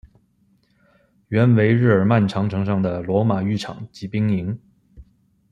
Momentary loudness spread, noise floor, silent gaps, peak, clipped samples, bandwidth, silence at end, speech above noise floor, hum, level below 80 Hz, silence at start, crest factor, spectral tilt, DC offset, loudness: 13 LU; -61 dBFS; none; -2 dBFS; under 0.1%; 7.6 kHz; 0.5 s; 43 dB; none; -54 dBFS; 1.3 s; 18 dB; -8.5 dB/octave; under 0.1%; -20 LUFS